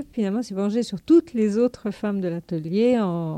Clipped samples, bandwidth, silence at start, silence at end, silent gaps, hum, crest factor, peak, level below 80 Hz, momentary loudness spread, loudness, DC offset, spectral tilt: under 0.1%; 10.5 kHz; 0 s; 0 s; none; none; 14 dB; -8 dBFS; -58 dBFS; 9 LU; -23 LUFS; under 0.1%; -7.5 dB/octave